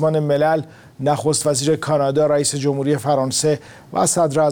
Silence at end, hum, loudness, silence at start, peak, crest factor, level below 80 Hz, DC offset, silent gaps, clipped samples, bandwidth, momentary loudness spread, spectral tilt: 0 s; none; -18 LUFS; 0 s; -6 dBFS; 12 dB; -56 dBFS; under 0.1%; none; under 0.1%; 18.5 kHz; 6 LU; -4.5 dB/octave